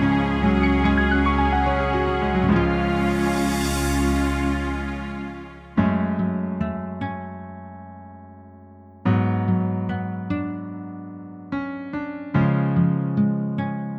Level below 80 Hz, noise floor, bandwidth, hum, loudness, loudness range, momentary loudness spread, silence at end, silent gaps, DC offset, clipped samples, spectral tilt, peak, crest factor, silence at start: -32 dBFS; -45 dBFS; 16 kHz; none; -22 LUFS; 7 LU; 16 LU; 0 s; none; under 0.1%; under 0.1%; -6.5 dB/octave; -6 dBFS; 16 dB; 0 s